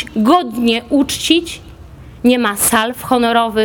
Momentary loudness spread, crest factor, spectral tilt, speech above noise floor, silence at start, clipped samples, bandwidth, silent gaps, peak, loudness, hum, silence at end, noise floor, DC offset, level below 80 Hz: 4 LU; 14 dB; -3 dB/octave; 22 dB; 0 s; under 0.1%; over 20 kHz; none; 0 dBFS; -14 LUFS; none; 0 s; -36 dBFS; under 0.1%; -42 dBFS